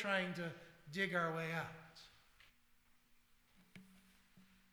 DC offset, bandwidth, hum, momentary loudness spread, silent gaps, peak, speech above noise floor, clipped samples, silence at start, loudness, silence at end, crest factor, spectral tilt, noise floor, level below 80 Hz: under 0.1%; over 20 kHz; none; 25 LU; none; -24 dBFS; 30 dB; under 0.1%; 0 s; -41 LUFS; 0.3 s; 22 dB; -5 dB/octave; -71 dBFS; -78 dBFS